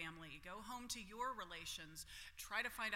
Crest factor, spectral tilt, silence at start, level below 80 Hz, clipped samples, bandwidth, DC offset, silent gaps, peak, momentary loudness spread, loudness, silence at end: 22 dB; -1.5 dB/octave; 0 s; -68 dBFS; under 0.1%; 16.5 kHz; under 0.1%; none; -28 dBFS; 9 LU; -48 LUFS; 0 s